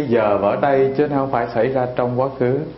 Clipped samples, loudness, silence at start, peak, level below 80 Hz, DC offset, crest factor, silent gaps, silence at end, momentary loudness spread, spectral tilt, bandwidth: under 0.1%; -18 LUFS; 0 s; -2 dBFS; -50 dBFS; under 0.1%; 14 dB; none; 0 s; 4 LU; -12 dB/octave; 5.8 kHz